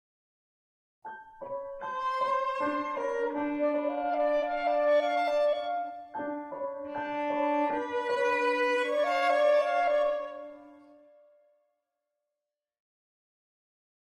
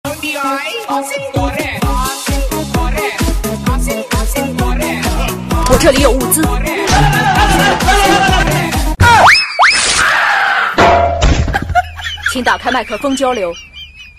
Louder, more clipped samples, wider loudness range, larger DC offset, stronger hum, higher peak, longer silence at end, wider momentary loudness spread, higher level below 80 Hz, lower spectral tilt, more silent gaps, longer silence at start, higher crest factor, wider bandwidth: second, -29 LUFS vs -12 LUFS; second, under 0.1% vs 0.1%; about the same, 6 LU vs 8 LU; neither; neither; second, -16 dBFS vs 0 dBFS; first, 3.3 s vs 0.1 s; first, 13 LU vs 9 LU; second, -70 dBFS vs -20 dBFS; about the same, -4 dB/octave vs -4 dB/octave; neither; first, 1.05 s vs 0.05 s; about the same, 16 dB vs 12 dB; second, 10.5 kHz vs 15 kHz